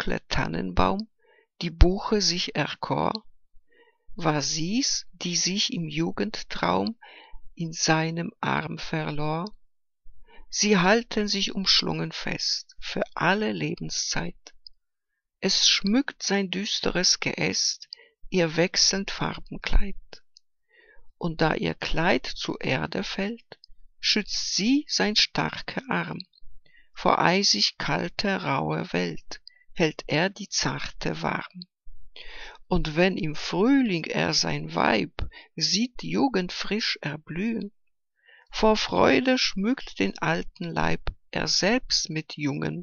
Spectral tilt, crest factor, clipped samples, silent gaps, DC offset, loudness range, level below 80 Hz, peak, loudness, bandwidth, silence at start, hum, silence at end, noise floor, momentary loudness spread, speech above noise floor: -3.5 dB/octave; 26 dB; under 0.1%; none; under 0.1%; 5 LU; -38 dBFS; -2 dBFS; -25 LUFS; 7.4 kHz; 0 s; none; 0 s; -82 dBFS; 13 LU; 56 dB